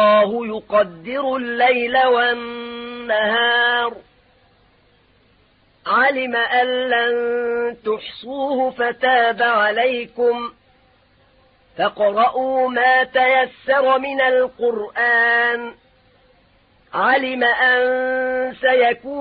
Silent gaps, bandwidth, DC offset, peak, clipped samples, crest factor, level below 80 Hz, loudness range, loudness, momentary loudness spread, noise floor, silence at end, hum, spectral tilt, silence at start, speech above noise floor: none; 5 kHz; under 0.1%; -4 dBFS; under 0.1%; 14 dB; -60 dBFS; 4 LU; -17 LUFS; 10 LU; -57 dBFS; 0 s; none; -8 dB/octave; 0 s; 39 dB